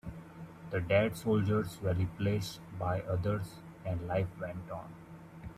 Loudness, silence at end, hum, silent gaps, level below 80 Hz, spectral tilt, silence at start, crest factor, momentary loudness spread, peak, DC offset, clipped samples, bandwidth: -34 LUFS; 0 s; none; none; -58 dBFS; -7 dB/octave; 0.05 s; 18 dB; 19 LU; -16 dBFS; under 0.1%; under 0.1%; 15 kHz